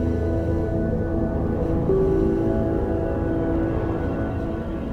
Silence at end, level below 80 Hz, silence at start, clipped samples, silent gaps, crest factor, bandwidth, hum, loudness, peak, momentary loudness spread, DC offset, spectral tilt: 0 s; -30 dBFS; 0 s; under 0.1%; none; 14 dB; 6.6 kHz; none; -23 LUFS; -8 dBFS; 5 LU; under 0.1%; -10 dB/octave